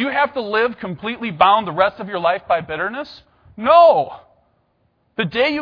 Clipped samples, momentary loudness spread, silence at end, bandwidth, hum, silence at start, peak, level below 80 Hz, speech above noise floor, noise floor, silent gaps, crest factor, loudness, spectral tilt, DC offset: under 0.1%; 15 LU; 0 s; 5.4 kHz; none; 0 s; 0 dBFS; -56 dBFS; 47 dB; -64 dBFS; none; 18 dB; -17 LUFS; -7 dB/octave; under 0.1%